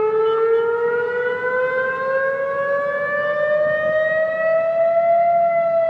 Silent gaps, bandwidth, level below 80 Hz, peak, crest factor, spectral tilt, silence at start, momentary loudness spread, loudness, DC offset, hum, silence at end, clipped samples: none; 5.4 kHz; -66 dBFS; -8 dBFS; 10 dB; -6 dB/octave; 0 s; 5 LU; -19 LUFS; under 0.1%; none; 0 s; under 0.1%